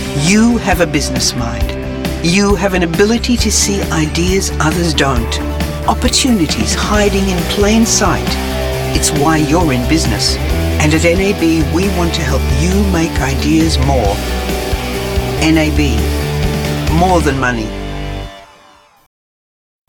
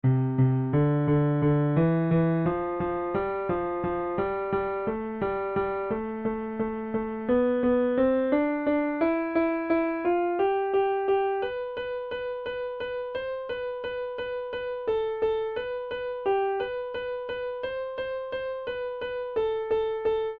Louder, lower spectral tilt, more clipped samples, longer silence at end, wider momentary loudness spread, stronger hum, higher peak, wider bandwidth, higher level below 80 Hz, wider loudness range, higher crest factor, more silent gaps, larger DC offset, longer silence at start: first, -13 LUFS vs -28 LUFS; second, -4.5 dB/octave vs -11 dB/octave; neither; first, 1.45 s vs 0 s; about the same, 7 LU vs 9 LU; neither; first, 0 dBFS vs -12 dBFS; first, 19 kHz vs 4.9 kHz; first, -22 dBFS vs -54 dBFS; second, 2 LU vs 6 LU; about the same, 14 dB vs 16 dB; neither; first, 0.2% vs under 0.1%; about the same, 0 s vs 0.05 s